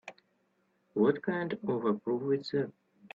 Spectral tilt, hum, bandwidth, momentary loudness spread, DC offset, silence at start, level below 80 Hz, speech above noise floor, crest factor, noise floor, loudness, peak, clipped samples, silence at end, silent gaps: -8 dB/octave; none; 7.4 kHz; 10 LU; under 0.1%; 0.05 s; -76 dBFS; 43 dB; 20 dB; -74 dBFS; -32 LUFS; -14 dBFS; under 0.1%; 0.05 s; none